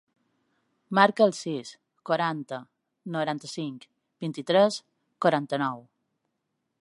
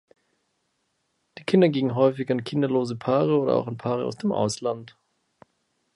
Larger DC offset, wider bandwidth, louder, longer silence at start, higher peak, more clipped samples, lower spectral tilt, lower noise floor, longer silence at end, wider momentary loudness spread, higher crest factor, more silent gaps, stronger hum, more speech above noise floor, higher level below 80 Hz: neither; about the same, 11.5 kHz vs 11.5 kHz; about the same, -26 LUFS vs -24 LUFS; second, 0.9 s vs 1.35 s; about the same, -4 dBFS vs -4 dBFS; neither; second, -5 dB/octave vs -6.5 dB/octave; first, -80 dBFS vs -74 dBFS; about the same, 1.05 s vs 1.1 s; first, 18 LU vs 8 LU; first, 26 dB vs 20 dB; neither; neither; about the same, 54 dB vs 51 dB; second, -82 dBFS vs -68 dBFS